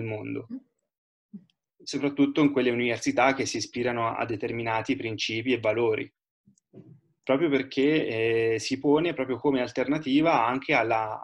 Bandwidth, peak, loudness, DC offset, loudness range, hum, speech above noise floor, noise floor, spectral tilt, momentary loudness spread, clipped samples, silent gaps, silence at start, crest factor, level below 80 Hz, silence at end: 11 kHz; -8 dBFS; -26 LUFS; under 0.1%; 4 LU; none; 26 dB; -52 dBFS; -5 dB/octave; 10 LU; under 0.1%; 0.98-1.29 s, 6.31-6.44 s; 0 s; 18 dB; -66 dBFS; 0 s